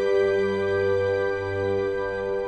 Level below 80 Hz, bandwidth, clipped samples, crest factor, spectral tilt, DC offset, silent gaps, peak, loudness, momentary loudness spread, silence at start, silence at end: -52 dBFS; 8.4 kHz; under 0.1%; 12 dB; -7 dB/octave; under 0.1%; none; -12 dBFS; -24 LUFS; 5 LU; 0 s; 0 s